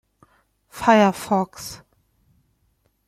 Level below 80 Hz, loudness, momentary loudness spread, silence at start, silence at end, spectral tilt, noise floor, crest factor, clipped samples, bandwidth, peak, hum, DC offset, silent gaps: -58 dBFS; -19 LUFS; 25 LU; 0.75 s; 1.3 s; -5.5 dB/octave; -67 dBFS; 22 dB; under 0.1%; 15.5 kHz; -2 dBFS; none; under 0.1%; none